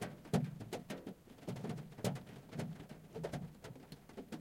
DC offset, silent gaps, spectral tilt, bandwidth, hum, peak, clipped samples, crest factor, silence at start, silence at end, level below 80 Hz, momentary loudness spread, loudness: under 0.1%; none; -6 dB/octave; 16.5 kHz; none; -20 dBFS; under 0.1%; 24 dB; 0 s; 0 s; -68 dBFS; 14 LU; -45 LUFS